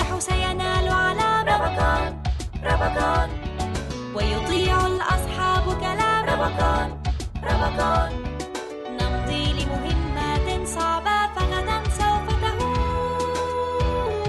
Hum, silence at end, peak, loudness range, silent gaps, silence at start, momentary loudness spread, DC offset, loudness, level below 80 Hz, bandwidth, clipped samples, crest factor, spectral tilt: none; 0 s; -6 dBFS; 3 LU; none; 0 s; 8 LU; under 0.1%; -23 LUFS; -30 dBFS; 12.5 kHz; under 0.1%; 16 dB; -5 dB/octave